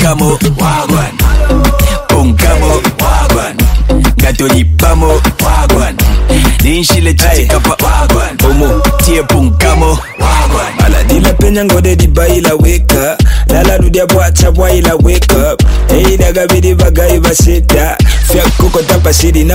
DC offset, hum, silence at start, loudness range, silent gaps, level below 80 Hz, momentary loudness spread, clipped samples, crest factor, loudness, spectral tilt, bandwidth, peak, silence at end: under 0.1%; none; 0 s; 1 LU; none; -10 dBFS; 3 LU; 0.2%; 6 dB; -8 LUFS; -5 dB/octave; 16.5 kHz; 0 dBFS; 0 s